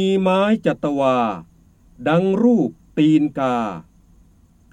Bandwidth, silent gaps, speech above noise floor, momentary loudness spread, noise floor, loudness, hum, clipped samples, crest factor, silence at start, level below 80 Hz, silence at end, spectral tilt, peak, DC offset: 9.4 kHz; none; 35 dB; 10 LU; -52 dBFS; -19 LUFS; none; under 0.1%; 14 dB; 0 s; -54 dBFS; 0.9 s; -7.5 dB/octave; -4 dBFS; under 0.1%